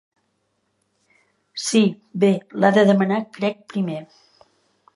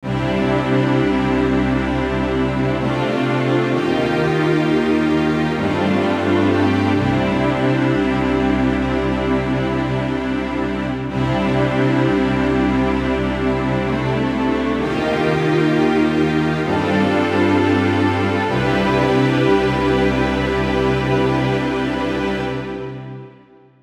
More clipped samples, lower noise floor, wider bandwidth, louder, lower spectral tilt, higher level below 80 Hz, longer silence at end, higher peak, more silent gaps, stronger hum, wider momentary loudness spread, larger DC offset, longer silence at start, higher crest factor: neither; first, -70 dBFS vs -47 dBFS; about the same, 11.5 kHz vs 11.5 kHz; about the same, -20 LUFS vs -18 LUFS; second, -5.5 dB/octave vs -7 dB/octave; second, -74 dBFS vs -34 dBFS; first, 0.9 s vs 0.5 s; about the same, -2 dBFS vs -4 dBFS; neither; neither; first, 12 LU vs 5 LU; neither; first, 1.55 s vs 0 s; first, 20 dB vs 14 dB